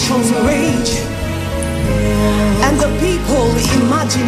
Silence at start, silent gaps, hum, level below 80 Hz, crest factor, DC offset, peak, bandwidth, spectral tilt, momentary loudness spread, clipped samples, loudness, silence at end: 0 s; none; none; -24 dBFS; 12 dB; under 0.1%; -2 dBFS; 15.5 kHz; -5 dB/octave; 6 LU; under 0.1%; -15 LUFS; 0 s